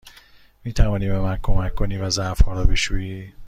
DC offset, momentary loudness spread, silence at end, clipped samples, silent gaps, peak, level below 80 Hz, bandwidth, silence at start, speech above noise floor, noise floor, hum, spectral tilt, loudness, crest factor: under 0.1%; 9 LU; 0 s; under 0.1%; none; -2 dBFS; -24 dBFS; 10.5 kHz; 0.05 s; 31 dB; -50 dBFS; none; -5 dB/octave; -23 LUFS; 18 dB